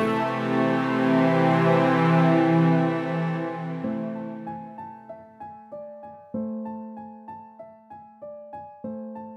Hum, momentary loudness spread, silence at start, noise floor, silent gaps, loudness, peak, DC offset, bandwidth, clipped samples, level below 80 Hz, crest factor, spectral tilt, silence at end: none; 23 LU; 0 s; -47 dBFS; none; -23 LUFS; -8 dBFS; under 0.1%; 7.6 kHz; under 0.1%; -70 dBFS; 18 dB; -8.5 dB/octave; 0 s